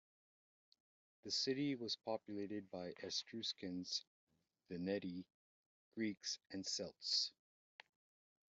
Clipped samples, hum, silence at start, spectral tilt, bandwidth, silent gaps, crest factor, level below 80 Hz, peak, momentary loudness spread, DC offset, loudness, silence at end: under 0.1%; none; 1.25 s; -3 dB/octave; 8 kHz; 4.07-4.27 s, 5.34-5.92 s; 20 dB; -88 dBFS; -26 dBFS; 12 LU; under 0.1%; -44 LUFS; 1.2 s